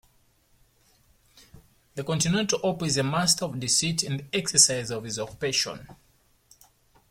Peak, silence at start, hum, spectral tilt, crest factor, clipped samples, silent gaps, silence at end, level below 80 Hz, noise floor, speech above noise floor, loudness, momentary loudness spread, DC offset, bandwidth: -4 dBFS; 1.95 s; none; -2.5 dB/octave; 26 dB; under 0.1%; none; 1.15 s; -58 dBFS; -64 dBFS; 38 dB; -24 LUFS; 13 LU; under 0.1%; 16.5 kHz